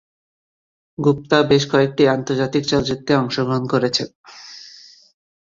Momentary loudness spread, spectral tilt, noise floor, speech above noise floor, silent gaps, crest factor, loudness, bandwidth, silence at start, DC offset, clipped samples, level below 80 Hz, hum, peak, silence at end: 22 LU; -5.5 dB/octave; -44 dBFS; 27 dB; 4.15-4.24 s; 18 dB; -18 LUFS; 7.6 kHz; 1 s; under 0.1%; under 0.1%; -52 dBFS; none; -2 dBFS; 0.75 s